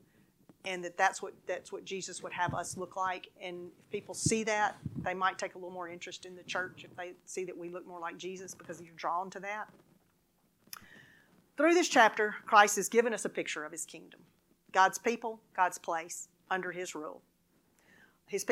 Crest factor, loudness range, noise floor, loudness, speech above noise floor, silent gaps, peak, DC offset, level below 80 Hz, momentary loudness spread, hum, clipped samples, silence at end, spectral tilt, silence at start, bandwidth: 28 dB; 13 LU; -73 dBFS; -33 LUFS; 39 dB; none; -8 dBFS; under 0.1%; -72 dBFS; 19 LU; none; under 0.1%; 0 s; -3 dB/octave; 0.65 s; 16 kHz